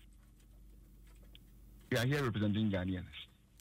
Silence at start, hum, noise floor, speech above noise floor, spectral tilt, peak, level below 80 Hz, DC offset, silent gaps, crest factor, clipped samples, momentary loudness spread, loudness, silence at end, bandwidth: 0.05 s; none; -60 dBFS; 26 dB; -6.5 dB/octave; -24 dBFS; -60 dBFS; under 0.1%; none; 16 dB; under 0.1%; 16 LU; -35 LUFS; 0.35 s; 16 kHz